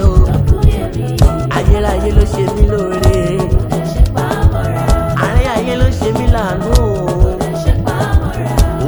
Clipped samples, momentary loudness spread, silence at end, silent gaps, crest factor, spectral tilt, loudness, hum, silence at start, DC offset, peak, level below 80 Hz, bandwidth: 0.8%; 3 LU; 0 s; none; 12 dB; -7 dB/octave; -14 LUFS; none; 0 s; under 0.1%; 0 dBFS; -16 dBFS; over 20 kHz